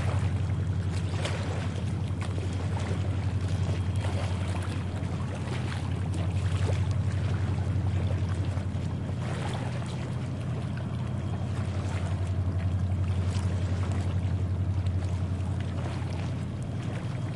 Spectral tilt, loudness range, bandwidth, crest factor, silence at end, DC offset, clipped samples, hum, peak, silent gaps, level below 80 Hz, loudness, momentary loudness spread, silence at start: -7 dB/octave; 2 LU; 11 kHz; 12 dB; 0 s; 0.2%; under 0.1%; none; -16 dBFS; none; -50 dBFS; -31 LUFS; 4 LU; 0 s